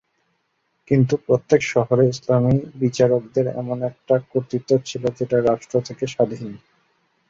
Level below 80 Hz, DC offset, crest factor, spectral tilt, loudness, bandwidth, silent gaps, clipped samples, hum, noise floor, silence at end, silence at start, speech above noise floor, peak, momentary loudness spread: -54 dBFS; under 0.1%; 18 dB; -7 dB/octave; -20 LUFS; 7.8 kHz; none; under 0.1%; none; -70 dBFS; 0.7 s; 0.9 s; 50 dB; -2 dBFS; 8 LU